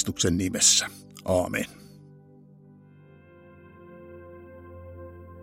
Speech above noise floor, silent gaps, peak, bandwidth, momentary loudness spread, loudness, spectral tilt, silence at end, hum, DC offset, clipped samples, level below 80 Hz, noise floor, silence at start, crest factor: 28 dB; none; -6 dBFS; 16 kHz; 28 LU; -23 LUFS; -2.5 dB/octave; 0 s; 50 Hz at -70 dBFS; under 0.1%; under 0.1%; -60 dBFS; -52 dBFS; 0 s; 24 dB